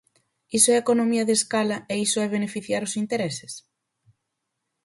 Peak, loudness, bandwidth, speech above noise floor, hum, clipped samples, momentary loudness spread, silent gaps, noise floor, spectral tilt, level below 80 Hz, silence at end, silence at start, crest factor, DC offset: -6 dBFS; -23 LUFS; 12 kHz; 57 dB; none; under 0.1%; 12 LU; none; -80 dBFS; -3 dB/octave; -68 dBFS; 1.25 s; 0.5 s; 20 dB; under 0.1%